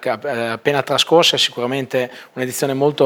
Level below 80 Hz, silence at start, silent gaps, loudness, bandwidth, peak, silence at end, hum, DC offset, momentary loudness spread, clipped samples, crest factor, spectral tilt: -70 dBFS; 0 s; none; -17 LUFS; 19.5 kHz; 0 dBFS; 0 s; none; under 0.1%; 11 LU; under 0.1%; 18 dB; -3.5 dB/octave